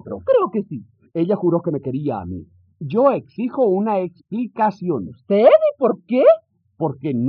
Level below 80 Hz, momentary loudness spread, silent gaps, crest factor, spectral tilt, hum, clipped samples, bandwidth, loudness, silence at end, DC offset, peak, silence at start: -66 dBFS; 13 LU; none; 18 dB; -7.5 dB/octave; none; under 0.1%; 5.4 kHz; -19 LUFS; 0 s; under 0.1%; -2 dBFS; 0.05 s